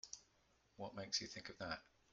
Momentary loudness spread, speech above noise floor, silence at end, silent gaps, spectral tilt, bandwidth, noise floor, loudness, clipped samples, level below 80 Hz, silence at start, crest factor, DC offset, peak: 12 LU; 29 dB; 0.25 s; none; -2 dB/octave; 9 kHz; -77 dBFS; -48 LUFS; under 0.1%; -76 dBFS; 0.05 s; 26 dB; under 0.1%; -26 dBFS